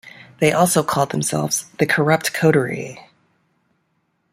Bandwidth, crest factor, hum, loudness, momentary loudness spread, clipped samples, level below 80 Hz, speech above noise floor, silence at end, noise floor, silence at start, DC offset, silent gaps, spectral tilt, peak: 16 kHz; 18 dB; none; -18 LUFS; 7 LU; under 0.1%; -58 dBFS; 50 dB; 1.3 s; -68 dBFS; 0.05 s; under 0.1%; none; -4.5 dB/octave; -2 dBFS